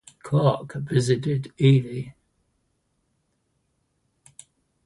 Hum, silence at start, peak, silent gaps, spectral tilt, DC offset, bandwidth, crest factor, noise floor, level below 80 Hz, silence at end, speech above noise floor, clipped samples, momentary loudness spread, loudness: none; 0.25 s; -6 dBFS; none; -7 dB/octave; under 0.1%; 11.5 kHz; 20 dB; -72 dBFS; -60 dBFS; 2.75 s; 50 dB; under 0.1%; 15 LU; -23 LUFS